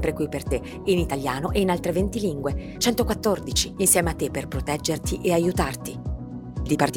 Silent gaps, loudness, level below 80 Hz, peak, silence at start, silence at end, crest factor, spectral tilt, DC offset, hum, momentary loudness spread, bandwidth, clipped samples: none; -24 LUFS; -36 dBFS; -4 dBFS; 0 s; 0 s; 20 dB; -4.5 dB/octave; under 0.1%; none; 11 LU; 19.5 kHz; under 0.1%